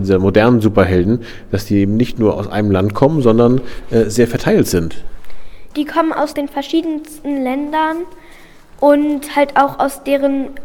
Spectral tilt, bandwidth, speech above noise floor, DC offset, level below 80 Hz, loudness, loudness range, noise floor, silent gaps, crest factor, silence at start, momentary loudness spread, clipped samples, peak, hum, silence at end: -6.5 dB/octave; 19.5 kHz; 25 dB; under 0.1%; -36 dBFS; -15 LUFS; 5 LU; -39 dBFS; none; 14 dB; 0 s; 11 LU; under 0.1%; 0 dBFS; none; 0 s